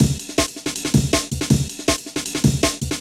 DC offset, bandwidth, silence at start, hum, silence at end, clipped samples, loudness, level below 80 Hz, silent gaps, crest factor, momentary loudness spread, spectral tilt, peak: under 0.1%; 16.5 kHz; 0 s; none; 0 s; under 0.1%; -20 LUFS; -34 dBFS; none; 18 dB; 5 LU; -4.5 dB/octave; -2 dBFS